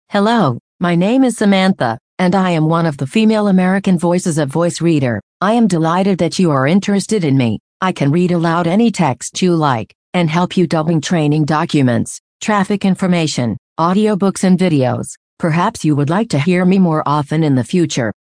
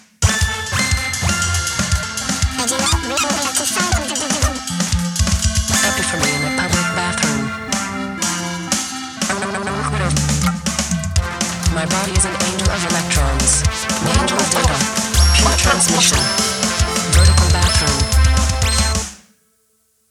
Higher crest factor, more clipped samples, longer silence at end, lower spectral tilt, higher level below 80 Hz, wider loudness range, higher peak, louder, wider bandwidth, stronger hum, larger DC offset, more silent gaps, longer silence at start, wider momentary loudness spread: about the same, 14 dB vs 16 dB; neither; second, 0.1 s vs 0.95 s; first, -6 dB/octave vs -3 dB/octave; second, -54 dBFS vs -22 dBFS; second, 1 LU vs 6 LU; about the same, 0 dBFS vs 0 dBFS; about the same, -14 LUFS vs -16 LUFS; second, 10.5 kHz vs 16.5 kHz; neither; neither; first, 0.60-0.79 s, 2.00-2.17 s, 5.23-5.40 s, 7.60-7.80 s, 9.95-10.13 s, 12.20-12.40 s, 13.58-13.76 s, 15.17-15.37 s vs none; about the same, 0.1 s vs 0.2 s; about the same, 6 LU vs 8 LU